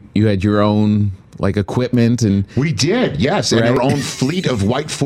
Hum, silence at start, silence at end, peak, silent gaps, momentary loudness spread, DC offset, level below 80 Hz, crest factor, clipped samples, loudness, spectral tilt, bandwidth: none; 0.15 s; 0 s; -2 dBFS; none; 5 LU; under 0.1%; -42 dBFS; 12 dB; under 0.1%; -16 LUFS; -6 dB/octave; 13.5 kHz